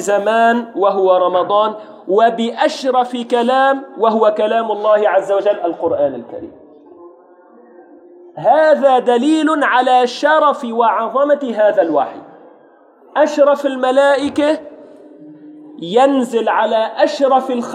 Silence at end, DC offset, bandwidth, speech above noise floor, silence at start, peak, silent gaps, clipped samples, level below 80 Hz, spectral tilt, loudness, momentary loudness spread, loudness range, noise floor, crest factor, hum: 0 s; under 0.1%; 12 kHz; 33 dB; 0 s; 0 dBFS; none; under 0.1%; -68 dBFS; -4.5 dB/octave; -14 LUFS; 6 LU; 4 LU; -47 dBFS; 14 dB; none